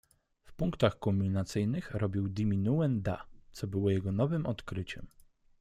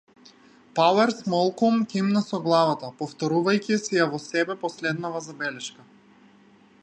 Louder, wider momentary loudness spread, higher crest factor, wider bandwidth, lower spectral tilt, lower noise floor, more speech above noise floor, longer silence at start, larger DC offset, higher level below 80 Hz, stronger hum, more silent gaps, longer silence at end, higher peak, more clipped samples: second, -33 LUFS vs -24 LUFS; about the same, 11 LU vs 10 LU; about the same, 20 dB vs 18 dB; first, 13 kHz vs 9.6 kHz; first, -7.5 dB/octave vs -5 dB/octave; about the same, -58 dBFS vs -55 dBFS; second, 26 dB vs 31 dB; second, 0.45 s vs 0.75 s; neither; first, -54 dBFS vs -74 dBFS; neither; neither; second, 0.5 s vs 1.15 s; second, -12 dBFS vs -6 dBFS; neither